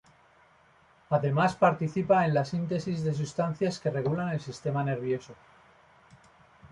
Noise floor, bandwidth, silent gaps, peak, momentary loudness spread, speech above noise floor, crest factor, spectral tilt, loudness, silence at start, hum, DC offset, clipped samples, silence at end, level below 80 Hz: -61 dBFS; 11 kHz; none; -10 dBFS; 8 LU; 33 dB; 20 dB; -7 dB/octave; -28 LUFS; 1.1 s; none; under 0.1%; under 0.1%; 0.05 s; -64 dBFS